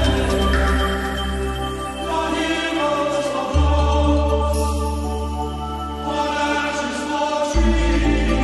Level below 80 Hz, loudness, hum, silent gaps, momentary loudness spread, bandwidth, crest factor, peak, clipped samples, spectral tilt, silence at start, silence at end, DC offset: -24 dBFS; -21 LUFS; none; none; 8 LU; 12.5 kHz; 12 dB; -6 dBFS; under 0.1%; -5.5 dB/octave; 0 s; 0 s; under 0.1%